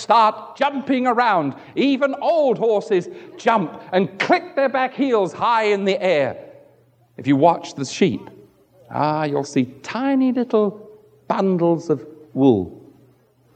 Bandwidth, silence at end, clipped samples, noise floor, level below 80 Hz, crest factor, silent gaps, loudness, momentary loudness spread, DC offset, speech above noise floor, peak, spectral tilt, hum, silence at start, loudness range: 9 kHz; 0.75 s; under 0.1%; -56 dBFS; -66 dBFS; 18 dB; none; -20 LUFS; 8 LU; under 0.1%; 37 dB; -2 dBFS; -6 dB/octave; none; 0 s; 3 LU